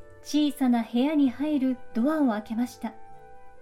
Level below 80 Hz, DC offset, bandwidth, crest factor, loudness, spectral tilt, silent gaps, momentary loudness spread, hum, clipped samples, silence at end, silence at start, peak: -60 dBFS; under 0.1%; 16 kHz; 12 dB; -26 LUFS; -5 dB/octave; none; 8 LU; none; under 0.1%; 0 s; 0 s; -14 dBFS